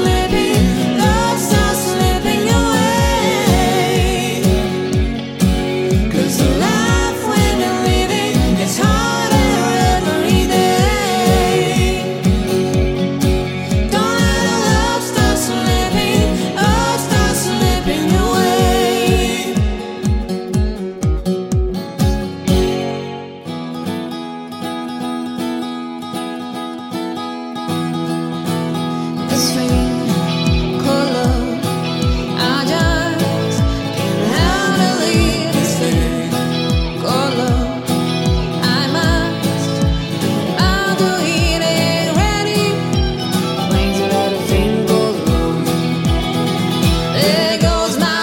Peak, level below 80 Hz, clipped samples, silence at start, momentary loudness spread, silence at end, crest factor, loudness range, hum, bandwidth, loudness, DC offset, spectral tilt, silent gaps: 0 dBFS; -24 dBFS; under 0.1%; 0 s; 8 LU; 0 s; 14 dB; 6 LU; none; 17 kHz; -16 LUFS; under 0.1%; -5 dB/octave; none